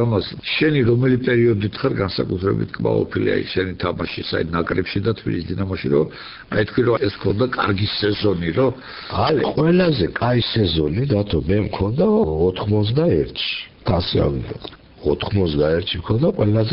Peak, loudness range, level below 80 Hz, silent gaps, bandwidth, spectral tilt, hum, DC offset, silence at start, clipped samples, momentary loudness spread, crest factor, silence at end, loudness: -6 dBFS; 3 LU; -38 dBFS; none; 5.6 kHz; -5.5 dB/octave; none; under 0.1%; 0 s; under 0.1%; 7 LU; 14 dB; 0 s; -20 LUFS